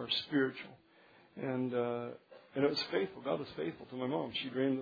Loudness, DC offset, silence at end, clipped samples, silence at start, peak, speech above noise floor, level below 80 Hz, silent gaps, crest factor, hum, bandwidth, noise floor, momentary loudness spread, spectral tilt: -37 LUFS; under 0.1%; 0 s; under 0.1%; 0 s; -18 dBFS; 28 dB; -78 dBFS; none; 20 dB; none; 5 kHz; -64 dBFS; 13 LU; -3.5 dB/octave